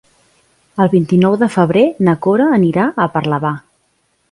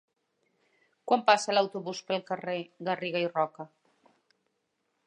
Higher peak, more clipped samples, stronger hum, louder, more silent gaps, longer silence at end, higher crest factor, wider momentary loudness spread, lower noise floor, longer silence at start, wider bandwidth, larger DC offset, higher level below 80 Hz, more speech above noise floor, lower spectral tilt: first, 0 dBFS vs -8 dBFS; neither; neither; first, -13 LUFS vs -29 LUFS; neither; second, 0.7 s vs 1.4 s; second, 14 dB vs 24 dB; second, 7 LU vs 15 LU; second, -62 dBFS vs -79 dBFS; second, 0.75 s vs 1.05 s; about the same, 11.5 kHz vs 11 kHz; neither; first, -52 dBFS vs -86 dBFS; about the same, 49 dB vs 50 dB; first, -8 dB/octave vs -4 dB/octave